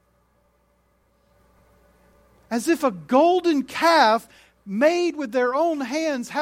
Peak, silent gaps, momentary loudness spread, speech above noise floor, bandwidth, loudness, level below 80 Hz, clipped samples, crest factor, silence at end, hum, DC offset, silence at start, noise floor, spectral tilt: -2 dBFS; none; 8 LU; 44 dB; 16.5 kHz; -21 LUFS; -64 dBFS; under 0.1%; 20 dB; 0 s; none; under 0.1%; 2.5 s; -64 dBFS; -4 dB/octave